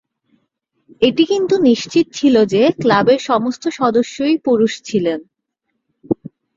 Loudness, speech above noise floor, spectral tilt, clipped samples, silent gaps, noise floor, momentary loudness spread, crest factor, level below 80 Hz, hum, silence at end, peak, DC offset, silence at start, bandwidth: -15 LUFS; 59 dB; -5.5 dB/octave; under 0.1%; none; -73 dBFS; 9 LU; 16 dB; -56 dBFS; none; 0.45 s; -2 dBFS; under 0.1%; 1 s; 7.8 kHz